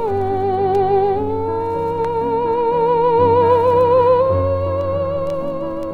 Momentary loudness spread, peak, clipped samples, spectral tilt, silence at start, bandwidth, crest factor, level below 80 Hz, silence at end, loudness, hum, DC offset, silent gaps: 8 LU; -4 dBFS; under 0.1%; -9 dB/octave; 0 s; 5.2 kHz; 12 dB; -42 dBFS; 0 s; -17 LUFS; none; under 0.1%; none